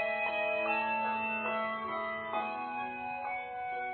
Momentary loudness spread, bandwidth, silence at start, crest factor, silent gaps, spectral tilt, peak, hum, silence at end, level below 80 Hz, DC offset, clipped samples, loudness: 7 LU; 4.5 kHz; 0 s; 16 dB; none; -1 dB/octave; -20 dBFS; none; 0 s; -72 dBFS; under 0.1%; under 0.1%; -34 LUFS